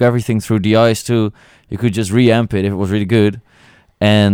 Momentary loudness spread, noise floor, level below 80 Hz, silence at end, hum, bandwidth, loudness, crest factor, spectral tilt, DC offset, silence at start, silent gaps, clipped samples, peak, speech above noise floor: 7 LU; -48 dBFS; -46 dBFS; 0 s; none; 16.5 kHz; -15 LUFS; 14 dB; -6.5 dB/octave; under 0.1%; 0 s; none; under 0.1%; 0 dBFS; 35 dB